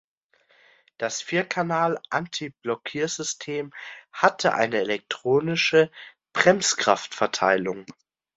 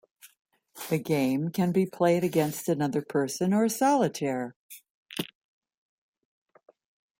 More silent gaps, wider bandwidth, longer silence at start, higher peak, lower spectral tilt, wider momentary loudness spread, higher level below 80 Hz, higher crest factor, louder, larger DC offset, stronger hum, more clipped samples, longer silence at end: second, none vs 0.39-0.45 s, 4.56-4.69 s, 4.90-5.06 s; second, 8.2 kHz vs 16.5 kHz; first, 1 s vs 0.25 s; first, -2 dBFS vs -12 dBFS; second, -3 dB/octave vs -6 dB/octave; about the same, 12 LU vs 14 LU; about the same, -68 dBFS vs -70 dBFS; first, 24 dB vs 18 dB; first, -24 LUFS vs -27 LUFS; neither; neither; neither; second, 0.45 s vs 1.95 s